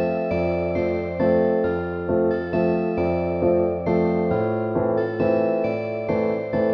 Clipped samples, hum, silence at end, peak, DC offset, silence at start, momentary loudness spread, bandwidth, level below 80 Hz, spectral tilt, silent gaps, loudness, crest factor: under 0.1%; none; 0 s; -8 dBFS; under 0.1%; 0 s; 4 LU; 6 kHz; -48 dBFS; -10 dB/octave; none; -22 LUFS; 14 dB